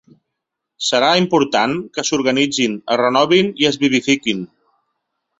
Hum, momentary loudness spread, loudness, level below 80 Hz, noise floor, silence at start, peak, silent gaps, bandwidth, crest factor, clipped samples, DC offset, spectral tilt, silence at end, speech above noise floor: none; 8 LU; -16 LUFS; -58 dBFS; -79 dBFS; 0.8 s; -2 dBFS; none; 8.2 kHz; 16 dB; under 0.1%; under 0.1%; -3.5 dB/octave; 0.95 s; 63 dB